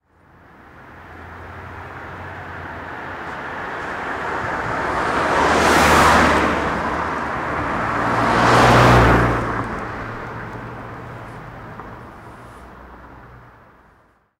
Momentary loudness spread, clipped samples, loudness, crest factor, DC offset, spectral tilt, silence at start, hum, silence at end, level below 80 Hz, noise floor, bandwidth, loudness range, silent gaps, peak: 24 LU; under 0.1%; -17 LUFS; 16 dB; under 0.1%; -5 dB/octave; 0.75 s; none; 0.95 s; -34 dBFS; -56 dBFS; 16 kHz; 19 LU; none; -4 dBFS